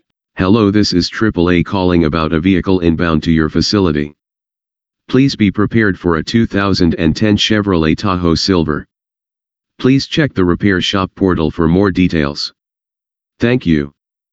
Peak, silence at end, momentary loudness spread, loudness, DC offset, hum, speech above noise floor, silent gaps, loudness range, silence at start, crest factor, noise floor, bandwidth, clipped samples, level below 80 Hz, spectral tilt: 0 dBFS; 0.45 s; 5 LU; -13 LUFS; 0.1%; none; 75 dB; none; 2 LU; 0.35 s; 14 dB; -87 dBFS; 8 kHz; under 0.1%; -32 dBFS; -6 dB/octave